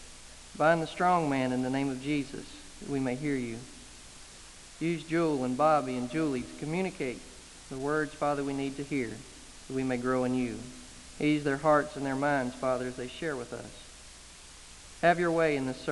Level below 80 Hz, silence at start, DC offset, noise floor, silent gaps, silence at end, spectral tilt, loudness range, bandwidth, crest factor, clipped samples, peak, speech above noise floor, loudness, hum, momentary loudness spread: -56 dBFS; 0 s; under 0.1%; -50 dBFS; none; 0 s; -5.5 dB/octave; 4 LU; 11.5 kHz; 22 dB; under 0.1%; -10 dBFS; 20 dB; -30 LUFS; none; 22 LU